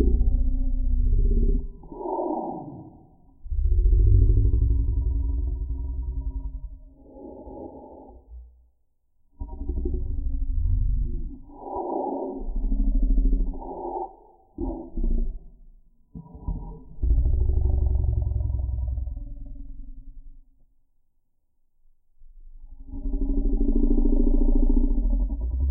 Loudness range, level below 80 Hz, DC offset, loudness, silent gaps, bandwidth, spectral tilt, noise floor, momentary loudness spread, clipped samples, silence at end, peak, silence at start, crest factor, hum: 13 LU; -24 dBFS; under 0.1%; -28 LUFS; none; 1.1 kHz; -17 dB/octave; -66 dBFS; 19 LU; under 0.1%; 0 s; -6 dBFS; 0 s; 18 dB; none